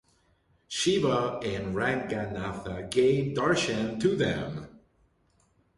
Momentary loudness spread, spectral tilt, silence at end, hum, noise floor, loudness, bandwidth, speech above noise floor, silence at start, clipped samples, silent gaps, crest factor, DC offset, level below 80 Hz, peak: 10 LU; -5 dB/octave; 1 s; none; -68 dBFS; -28 LUFS; 11.5 kHz; 40 dB; 0.7 s; under 0.1%; none; 18 dB; under 0.1%; -54 dBFS; -12 dBFS